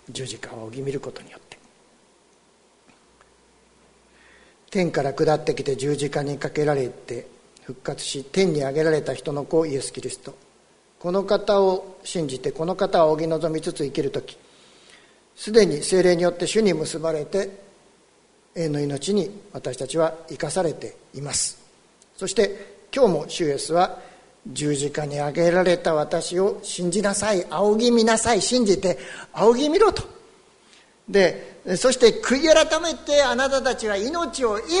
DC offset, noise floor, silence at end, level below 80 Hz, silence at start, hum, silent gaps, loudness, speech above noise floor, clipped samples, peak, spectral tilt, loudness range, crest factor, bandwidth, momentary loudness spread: under 0.1%; -58 dBFS; 0 s; -50 dBFS; 0.1 s; none; none; -22 LUFS; 36 dB; under 0.1%; -2 dBFS; -4 dB/octave; 7 LU; 22 dB; 11 kHz; 15 LU